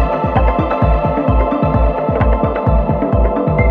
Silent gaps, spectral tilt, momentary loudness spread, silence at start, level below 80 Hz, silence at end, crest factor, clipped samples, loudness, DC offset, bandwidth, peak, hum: none; -10.5 dB/octave; 1 LU; 0 s; -18 dBFS; 0 s; 12 dB; under 0.1%; -15 LUFS; under 0.1%; 4.3 kHz; -2 dBFS; none